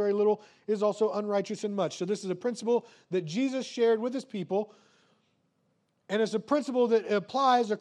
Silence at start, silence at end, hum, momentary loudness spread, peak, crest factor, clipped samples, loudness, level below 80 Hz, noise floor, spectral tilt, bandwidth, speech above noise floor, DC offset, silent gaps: 0 s; 0 s; none; 8 LU; -12 dBFS; 16 dB; under 0.1%; -29 LUFS; -88 dBFS; -74 dBFS; -5.5 dB/octave; 10.5 kHz; 45 dB; under 0.1%; none